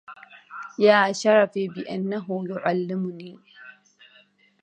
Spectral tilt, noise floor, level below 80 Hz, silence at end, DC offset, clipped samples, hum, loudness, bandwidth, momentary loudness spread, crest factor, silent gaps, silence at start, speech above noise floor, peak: -5 dB/octave; -58 dBFS; -76 dBFS; 0.9 s; under 0.1%; under 0.1%; none; -23 LUFS; 9.2 kHz; 23 LU; 22 dB; none; 0.1 s; 35 dB; -4 dBFS